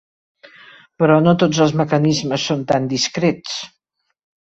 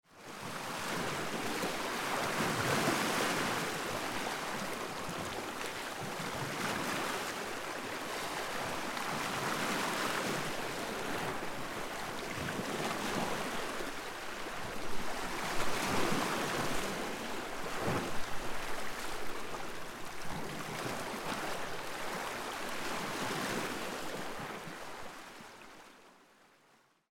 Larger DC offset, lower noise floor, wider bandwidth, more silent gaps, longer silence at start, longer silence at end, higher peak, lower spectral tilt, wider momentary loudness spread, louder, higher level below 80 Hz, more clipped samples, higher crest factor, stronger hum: neither; second, -45 dBFS vs -68 dBFS; second, 8 kHz vs 16.5 kHz; neither; first, 1 s vs 0.1 s; about the same, 0.95 s vs 1 s; first, -2 dBFS vs -18 dBFS; first, -5.5 dB/octave vs -3 dB/octave; first, 12 LU vs 9 LU; first, -17 LUFS vs -37 LUFS; about the same, -56 dBFS vs -56 dBFS; neither; about the same, 16 dB vs 18 dB; neither